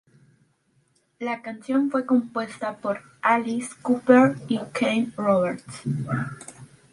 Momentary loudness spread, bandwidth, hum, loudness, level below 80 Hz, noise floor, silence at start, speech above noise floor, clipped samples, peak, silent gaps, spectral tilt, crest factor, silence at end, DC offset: 14 LU; 11.5 kHz; none; -24 LUFS; -66 dBFS; -66 dBFS; 1.2 s; 43 dB; under 0.1%; -2 dBFS; none; -6.5 dB/octave; 22 dB; 0.3 s; under 0.1%